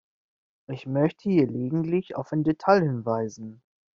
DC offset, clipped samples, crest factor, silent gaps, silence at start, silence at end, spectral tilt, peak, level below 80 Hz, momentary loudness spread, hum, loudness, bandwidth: under 0.1%; under 0.1%; 20 dB; none; 0.7 s; 0.4 s; -7.5 dB/octave; -6 dBFS; -64 dBFS; 16 LU; none; -25 LUFS; 7.2 kHz